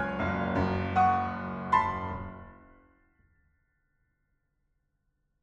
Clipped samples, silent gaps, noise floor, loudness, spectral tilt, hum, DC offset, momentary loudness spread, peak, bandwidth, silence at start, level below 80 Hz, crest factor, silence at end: under 0.1%; none; -77 dBFS; -29 LUFS; -7.5 dB/octave; none; under 0.1%; 14 LU; -12 dBFS; 7.8 kHz; 0 s; -52 dBFS; 20 dB; 2.85 s